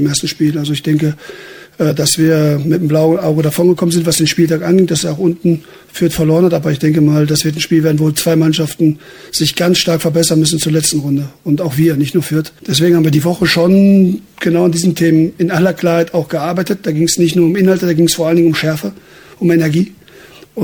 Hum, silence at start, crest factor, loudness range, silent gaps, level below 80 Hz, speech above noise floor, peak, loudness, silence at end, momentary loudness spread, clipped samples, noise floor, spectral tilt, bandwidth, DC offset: none; 0 s; 12 dB; 2 LU; none; -46 dBFS; 27 dB; 0 dBFS; -13 LUFS; 0 s; 7 LU; under 0.1%; -39 dBFS; -5.5 dB/octave; 19 kHz; under 0.1%